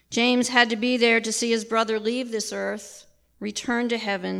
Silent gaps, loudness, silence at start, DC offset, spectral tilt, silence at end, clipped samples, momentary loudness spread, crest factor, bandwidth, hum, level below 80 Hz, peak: none; -23 LUFS; 0.1 s; under 0.1%; -2.5 dB/octave; 0 s; under 0.1%; 12 LU; 20 dB; 14 kHz; none; -66 dBFS; -4 dBFS